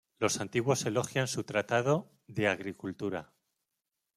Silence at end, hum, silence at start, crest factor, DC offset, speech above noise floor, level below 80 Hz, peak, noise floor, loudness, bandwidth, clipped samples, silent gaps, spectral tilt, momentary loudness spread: 0.95 s; none; 0.2 s; 20 dB; under 0.1%; 55 dB; -72 dBFS; -12 dBFS; -86 dBFS; -32 LUFS; 15 kHz; under 0.1%; none; -4.5 dB/octave; 9 LU